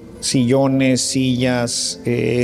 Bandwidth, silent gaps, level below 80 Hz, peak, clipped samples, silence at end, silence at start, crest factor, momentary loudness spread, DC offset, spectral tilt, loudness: 15 kHz; none; -48 dBFS; -4 dBFS; under 0.1%; 0 s; 0 s; 14 dB; 5 LU; under 0.1%; -4.5 dB/octave; -17 LUFS